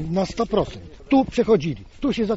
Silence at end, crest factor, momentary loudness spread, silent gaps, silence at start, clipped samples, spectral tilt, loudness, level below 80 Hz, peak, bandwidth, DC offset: 0 s; 16 dB; 11 LU; none; 0 s; under 0.1%; -6 dB/octave; -22 LUFS; -42 dBFS; -6 dBFS; 8 kHz; under 0.1%